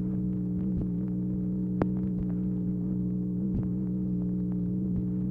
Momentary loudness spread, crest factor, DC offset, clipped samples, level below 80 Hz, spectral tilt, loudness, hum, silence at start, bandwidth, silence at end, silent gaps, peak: 2 LU; 20 dB; under 0.1%; under 0.1%; -44 dBFS; -12.5 dB/octave; -30 LUFS; 60 Hz at -45 dBFS; 0 s; 2.5 kHz; 0 s; none; -10 dBFS